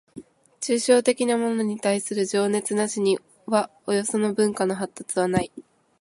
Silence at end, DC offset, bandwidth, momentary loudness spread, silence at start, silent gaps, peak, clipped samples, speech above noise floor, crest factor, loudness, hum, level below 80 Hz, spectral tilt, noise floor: 0.4 s; under 0.1%; 11.5 kHz; 7 LU; 0.15 s; none; -6 dBFS; under 0.1%; 22 dB; 18 dB; -24 LUFS; none; -60 dBFS; -4.5 dB/octave; -45 dBFS